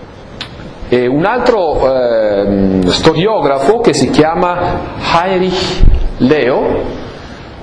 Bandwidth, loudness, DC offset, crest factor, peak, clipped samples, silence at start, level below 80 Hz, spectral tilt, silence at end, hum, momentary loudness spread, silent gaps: 10.5 kHz; -12 LUFS; under 0.1%; 12 dB; 0 dBFS; 0.5%; 0 s; -20 dBFS; -5.5 dB/octave; 0 s; none; 16 LU; none